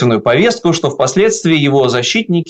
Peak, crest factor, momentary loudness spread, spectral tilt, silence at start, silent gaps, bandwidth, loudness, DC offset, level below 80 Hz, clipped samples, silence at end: -2 dBFS; 10 dB; 3 LU; -5 dB/octave; 0 s; none; 9 kHz; -12 LUFS; under 0.1%; -50 dBFS; under 0.1%; 0 s